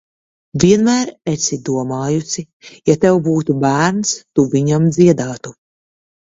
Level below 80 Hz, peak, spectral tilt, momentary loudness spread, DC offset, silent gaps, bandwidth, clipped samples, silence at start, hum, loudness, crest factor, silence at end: -50 dBFS; 0 dBFS; -5.5 dB/octave; 13 LU; under 0.1%; 2.53-2.60 s; 8 kHz; under 0.1%; 0.55 s; none; -15 LUFS; 16 dB; 0.8 s